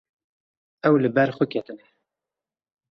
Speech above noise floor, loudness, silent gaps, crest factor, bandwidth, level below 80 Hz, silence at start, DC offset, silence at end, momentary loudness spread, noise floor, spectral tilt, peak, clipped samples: 68 dB; -22 LUFS; none; 20 dB; 6 kHz; -68 dBFS; 0.85 s; under 0.1%; 1.15 s; 12 LU; -90 dBFS; -9 dB/octave; -6 dBFS; under 0.1%